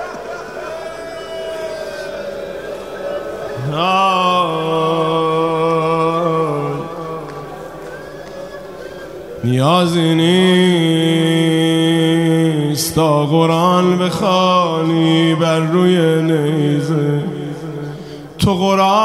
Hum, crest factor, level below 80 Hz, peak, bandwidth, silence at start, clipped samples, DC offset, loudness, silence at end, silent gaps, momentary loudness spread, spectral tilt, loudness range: none; 14 dB; -48 dBFS; 0 dBFS; 15.5 kHz; 0 s; under 0.1%; 0.2%; -15 LUFS; 0 s; none; 17 LU; -6 dB/octave; 10 LU